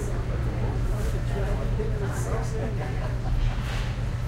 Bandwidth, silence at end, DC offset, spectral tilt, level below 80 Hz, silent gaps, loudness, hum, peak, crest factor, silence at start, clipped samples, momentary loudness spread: 14 kHz; 0 s; under 0.1%; -6.5 dB/octave; -28 dBFS; none; -29 LUFS; none; -14 dBFS; 12 dB; 0 s; under 0.1%; 2 LU